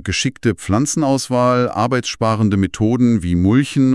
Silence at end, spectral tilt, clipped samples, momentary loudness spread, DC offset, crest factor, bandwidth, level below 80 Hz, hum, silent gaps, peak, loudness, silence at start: 0 s; -5.5 dB/octave; under 0.1%; 4 LU; under 0.1%; 14 dB; 12 kHz; -44 dBFS; none; none; -2 dBFS; -16 LUFS; 0 s